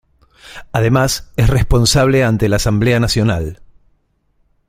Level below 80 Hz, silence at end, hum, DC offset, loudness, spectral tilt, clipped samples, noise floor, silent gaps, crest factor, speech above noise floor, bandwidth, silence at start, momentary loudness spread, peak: -26 dBFS; 1.15 s; none; under 0.1%; -14 LUFS; -5 dB/octave; under 0.1%; -60 dBFS; none; 16 dB; 47 dB; 16 kHz; 0.45 s; 10 LU; 0 dBFS